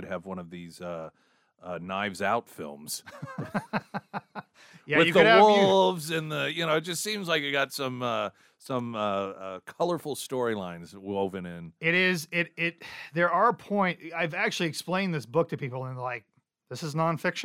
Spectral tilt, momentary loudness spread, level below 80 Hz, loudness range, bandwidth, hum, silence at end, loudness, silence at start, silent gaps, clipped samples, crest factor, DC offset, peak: -4.5 dB/octave; 18 LU; -72 dBFS; 11 LU; 16 kHz; none; 0 s; -27 LUFS; 0 s; none; under 0.1%; 22 dB; under 0.1%; -6 dBFS